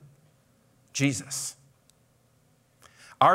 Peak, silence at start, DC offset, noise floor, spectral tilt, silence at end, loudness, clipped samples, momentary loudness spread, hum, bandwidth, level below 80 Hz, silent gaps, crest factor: -6 dBFS; 0.95 s; under 0.1%; -65 dBFS; -4 dB/octave; 0 s; -29 LUFS; under 0.1%; 27 LU; none; 16 kHz; -74 dBFS; none; 24 dB